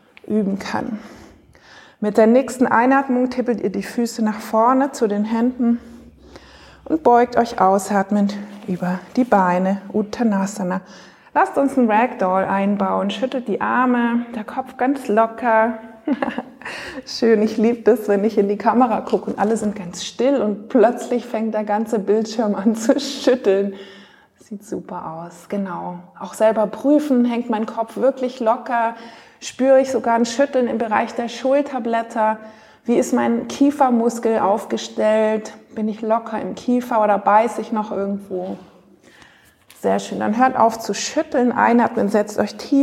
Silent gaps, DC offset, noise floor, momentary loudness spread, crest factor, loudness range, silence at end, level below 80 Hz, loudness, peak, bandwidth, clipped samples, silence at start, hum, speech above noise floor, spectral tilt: none; under 0.1%; -50 dBFS; 12 LU; 18 dB; 3 LU; 0 s; -60 dBFS; -19 LUFS; -2 dBFS; 15 kHz; under 0.1%; 0.3 s; none; 32 dB; -5.5 dB/octave